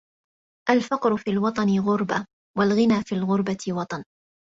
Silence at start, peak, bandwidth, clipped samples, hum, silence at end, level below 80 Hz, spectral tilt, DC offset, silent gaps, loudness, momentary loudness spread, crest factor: 0.65 s; -2 dBFS; 7.8 kHz; under 0.1%; none; 0.55 s; -62 dBFS; -6.5 dB/octave; under 0.1%; 2.33-2.54 s; -24 LUFS; 9 LU; 20 dB